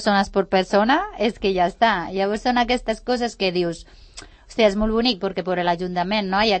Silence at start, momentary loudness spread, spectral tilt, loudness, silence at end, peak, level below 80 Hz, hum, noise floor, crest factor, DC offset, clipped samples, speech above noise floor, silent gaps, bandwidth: 0 s; 6 LU; -5 dB/octave; -21 LUFS; 0 s; -4 dBFS; -42 dBFS; none; -43 dBFS; 16 dB; under 0.1%; under 0.1%; 22 dB; none; 8.8 kHz